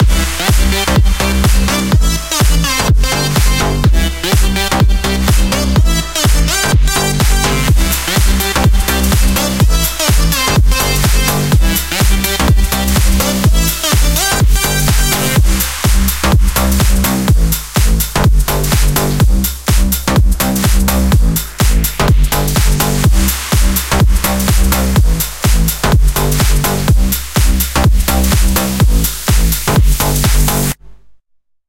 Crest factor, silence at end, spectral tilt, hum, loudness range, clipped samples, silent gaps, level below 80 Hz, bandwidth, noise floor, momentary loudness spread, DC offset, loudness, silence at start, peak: 10 dB; 0.95 s; -4 dB/octave; none; 1 LU; under 0.1%; none; -14 dBFS; 17 kHz; -59 dBFS; 2 LU; 1%; -12 LUFS; 0 s; 0 dBFS